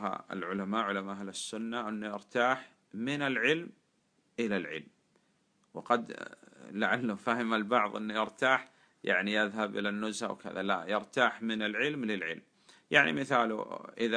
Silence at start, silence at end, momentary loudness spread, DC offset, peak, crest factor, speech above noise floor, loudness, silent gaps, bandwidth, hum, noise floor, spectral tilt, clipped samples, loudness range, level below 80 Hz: 0 s; 0 s; 13 LU; under 0.1%; -10 dBFS; 24 dB; 41 dB; -32 LUFS; none; 10.5 kHz; none; -73 dBFS; -4.5 dB/octave; under 0.1%; 5 LU; -80 dBFS